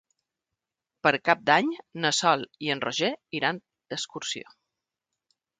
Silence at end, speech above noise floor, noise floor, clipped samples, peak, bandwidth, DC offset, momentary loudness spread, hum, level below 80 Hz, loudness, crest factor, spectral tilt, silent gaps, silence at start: 1.15 s; 61 dB; -87 dBFS; under 0.1%; -4 dBFS; 9.6 kHz; under 0.1%; 12 LU; none; -74 dBFS; -26 LUFS; 24 dB; -3 dB/octave; none; 1.05 s